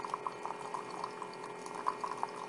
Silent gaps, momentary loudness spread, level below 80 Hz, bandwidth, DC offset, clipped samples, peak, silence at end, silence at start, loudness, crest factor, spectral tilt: none; 6 LU; -82 dBFS; 11.5 kHz; under 0.1%; under 0.1%; -18 dBFS; 0 s; 0 s; -41 LUFS; 24 dB; -3.5 dB/octave